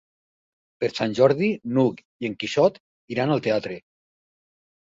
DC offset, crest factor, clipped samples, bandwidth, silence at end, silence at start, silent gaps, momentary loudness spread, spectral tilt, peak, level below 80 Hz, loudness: under 0.1%; 20 dB; under 0.1%; 7.8 kHz; 1.05 s; 0.8 s; 2.05-2.20 s, 2.80-3.08 s; 13 LU; -6.5 dB/octave; -4 dBFS; -64 dBFS; -23 LUFS